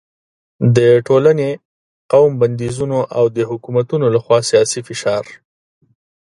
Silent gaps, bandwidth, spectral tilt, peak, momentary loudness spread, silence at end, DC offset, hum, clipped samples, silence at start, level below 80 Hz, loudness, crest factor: 1.65-2.09 s; 11.5 kHz; -6 dB/octave; 0 dBFS; 10 LU; 0.95 s; under 0.1%; none; under 0.1%; 0.6 s; -54 dBFS; -15 LUFS; 16 dB